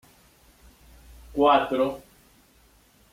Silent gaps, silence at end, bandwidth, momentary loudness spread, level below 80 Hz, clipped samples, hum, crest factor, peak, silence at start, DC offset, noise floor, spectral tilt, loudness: none; 1.1 s; 16.5 kHz; 16 LU; -54 dBFS; under 0.1%; none; 20 dB; -8 dBFS; 1.3 s; under 0.1%; -59 dBFS; -5.5 dB/octave; -23 LUFS